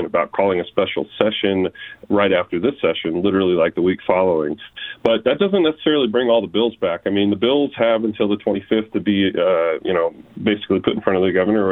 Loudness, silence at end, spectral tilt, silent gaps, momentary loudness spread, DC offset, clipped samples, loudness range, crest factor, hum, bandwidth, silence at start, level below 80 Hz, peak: -19 LUFS; 0 s; -8.5 dB/octave; none; 5 LU; under 0.1%; under 0.1%; 1 LU; 18 dB; none; 4.2 kHz; 0 s; -56 dBFS; 0 dBFS